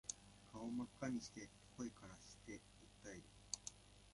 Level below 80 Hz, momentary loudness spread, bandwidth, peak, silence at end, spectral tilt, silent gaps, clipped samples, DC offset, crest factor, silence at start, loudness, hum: -72 dBFS; 13 LU; 11.5 kHz; -28 dBFS; 0 s; -3.5 dB/octave; none; under 0.1%; under 0.1%; 26 dB; 0.05 s; -52 LUFS; 50 Hz at -70 dBFS